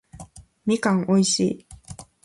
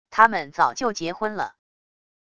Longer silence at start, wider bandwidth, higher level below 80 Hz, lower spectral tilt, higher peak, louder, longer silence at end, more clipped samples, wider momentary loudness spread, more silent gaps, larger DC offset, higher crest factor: about the same, 0.15 s vs 0.1 s; first, 11.5 kHz vs 10 kHz; first, -54 dBFS vs -62 dBFS; about the same, -4.5 dB/octave vs -3.5 dB/octave; second, -8 dBFS vs 0 dBFS; about the same, -22 LUFS vs -23 LUFS; second, 0.2 s vs 0.75 s; neither; first, 22 LU vs 12 LU; neither; second, under 0.1% vs 0.4%; second, 16 dB vs 24 dB